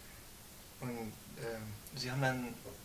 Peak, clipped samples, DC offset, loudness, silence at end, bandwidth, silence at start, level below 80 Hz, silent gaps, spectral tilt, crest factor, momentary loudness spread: -18 dBFS; under 0.1%; under 0.1%; -41 LUFS; 0 s; 16 kHz; 0 s; -62 dBFS; none; -5 dB/octave; 24 dB; 17 LU